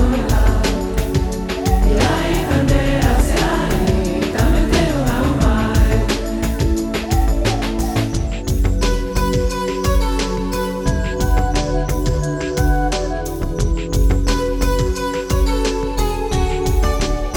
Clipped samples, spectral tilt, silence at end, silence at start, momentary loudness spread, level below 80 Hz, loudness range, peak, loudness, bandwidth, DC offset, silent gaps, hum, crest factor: under 0.1%; -5.5 dB/octave; 0 s; 0 s; 5 LU; -20 dBFS; 3 LU; 0 dBFS; -18 LUFS; 19 kHz; under 0.1%; none; none; 16 dB